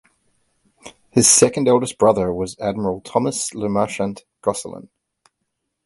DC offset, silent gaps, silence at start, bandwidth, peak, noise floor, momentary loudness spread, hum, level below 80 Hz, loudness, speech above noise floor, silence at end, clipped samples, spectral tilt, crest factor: under 0.1%; none; 0.85 s; 12 kHz; 0 dBFS; -76 dBFS; 14 LU; none; -52 dBFS; -18 LUFS; 57 dB; 1.05 s; under 0.1%; -3.5 dB/octave; 20 dB